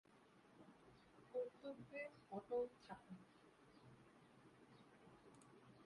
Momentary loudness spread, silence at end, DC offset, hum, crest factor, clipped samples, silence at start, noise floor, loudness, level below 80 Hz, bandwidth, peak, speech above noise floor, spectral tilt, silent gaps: 21 LU; 0 s; under 0.1%; none; 20 dB; under 0.1%; 0.1 s; -71 dBFS; -52 LUFS; -86 dBFS; 11 kHz; -36 dBFS; 20 dB; -6.5 dB/octave; none